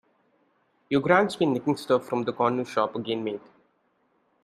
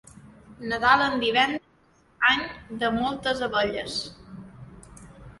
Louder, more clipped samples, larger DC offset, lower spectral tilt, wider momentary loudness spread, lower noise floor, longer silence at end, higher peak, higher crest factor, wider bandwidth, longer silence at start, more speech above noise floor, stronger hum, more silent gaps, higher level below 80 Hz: about the same, -25 LUFS vs -24 LUFS; neither; neither; first, -6 dB/octave vs -3.5 dB/octave; second, 9 LU vs 20 LU; first, -69 dBFS vs -61 dBFS; first, 1.05 s vs 0.1 s; about the same, -4 dBFS vs -4 dBFS; about the same, 24 dB vs 22 dB; first, 14.5 kHz vs 11.5 kHz; first, 0.9 s vs 0.15 s; first, 44 dB vs 36 dB; neither; neither; second, -70 dBFS vs -54 dBFS